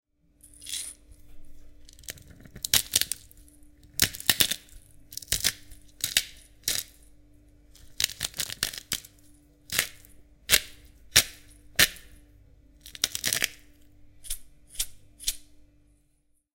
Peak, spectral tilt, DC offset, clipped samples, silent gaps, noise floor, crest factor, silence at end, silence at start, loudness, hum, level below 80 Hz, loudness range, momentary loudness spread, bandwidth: 0 dBFS; 0.5 dB/octave; under 0.1%; under 0.1%; none; -68 dBFS; 32 dB; 1.1 s; 0.6 s; -27 LUFS; none; -50 dBFS; 6 LU; 21 LU; 17 kHz